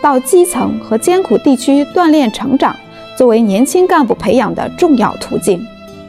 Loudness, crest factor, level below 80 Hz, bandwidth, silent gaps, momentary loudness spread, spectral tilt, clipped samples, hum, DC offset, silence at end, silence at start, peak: -12 LUFS; 12 dB; -46 dBFS; 14.5 kHz; none; 7 LU; -5 dB/octave; under 0.1%; none; 0.2%; 0 s; 0 s; 0 dBFS